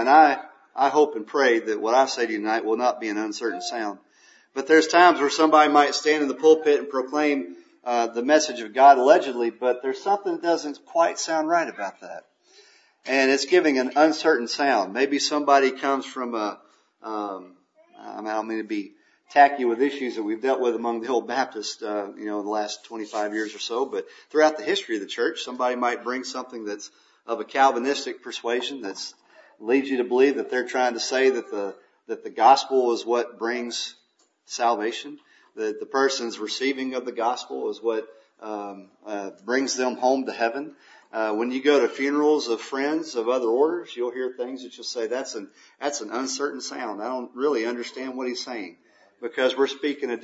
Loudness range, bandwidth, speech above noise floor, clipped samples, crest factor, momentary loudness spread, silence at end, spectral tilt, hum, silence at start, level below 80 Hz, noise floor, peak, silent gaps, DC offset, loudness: 8 LU; 8 kHz; 40 dB; under 0.1%; 22 dB; 16 LU; 0.05 s; -2.5 dB/octave; none; 0 s; -86 dBFS; -63 dBFS; -2 dBFS; none; under 0.1%; -23 LUFS